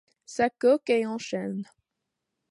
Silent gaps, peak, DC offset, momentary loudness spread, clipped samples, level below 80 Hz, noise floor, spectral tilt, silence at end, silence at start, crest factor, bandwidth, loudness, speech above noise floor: none; -12 dBFS; under 0.1%; 15 LU; under 0.1%; -70 dBFS; -84 dBFS; -5 dB/octave; 0.85 s; 0.3 s; 16 dB; 11.5 kHz; -26 LUFS; 58 dB